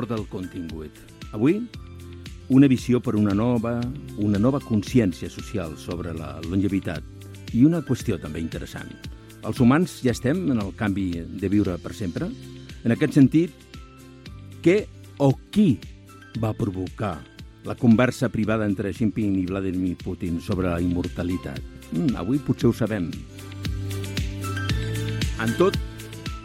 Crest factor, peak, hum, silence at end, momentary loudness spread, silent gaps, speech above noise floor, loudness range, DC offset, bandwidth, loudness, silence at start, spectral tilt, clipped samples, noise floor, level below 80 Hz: 20 dB; -4 dBFS; none; 0 s; 19 LU; none; 21 dB; 4 LU; under 0.1%; 16 kHz; -24 LUFS; 0 s; -7 dB/octave; under 0.1%; -44 dBFS; -42 dBFS